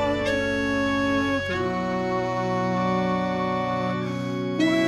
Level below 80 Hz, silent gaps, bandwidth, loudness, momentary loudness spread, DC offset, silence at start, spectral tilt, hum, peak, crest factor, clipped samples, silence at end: -48 dBFS; none; 12.5 kHz; -25 LUFS; 4 LU; under 0.1%; 0 s; -6 dB/octave; none; -10 dBFS; 14 dB; under 0.1%; 0 s